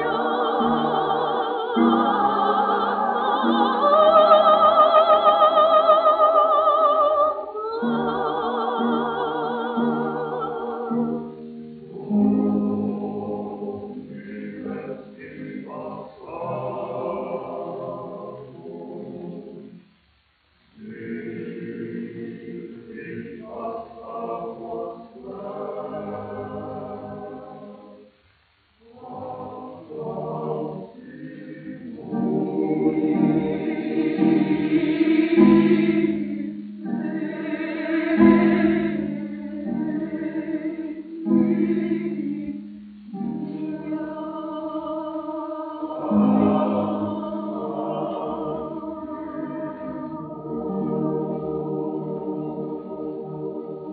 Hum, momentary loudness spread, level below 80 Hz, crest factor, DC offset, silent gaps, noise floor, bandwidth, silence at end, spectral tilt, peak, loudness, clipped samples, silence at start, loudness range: none; 20 LU; -60 dBFS; 22 dB; under 0.1%; none; -62 dBFS; 4.6 kHz; 0 s; -5.5 dB/octave; -2 dBFS; -22 LUFS; under 0.1%; 0 s; 18 LU